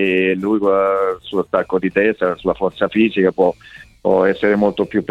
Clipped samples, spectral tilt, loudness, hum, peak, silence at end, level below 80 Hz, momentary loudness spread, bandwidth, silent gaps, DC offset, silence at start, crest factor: under 0.1%; -7.5 dB/octave; -17 LUFS; none; -2 dBFS; 0.05 s; -50 dBFS; 5 LU; 7.2 kHz; none; under 0.1%; 0 s; 16 dB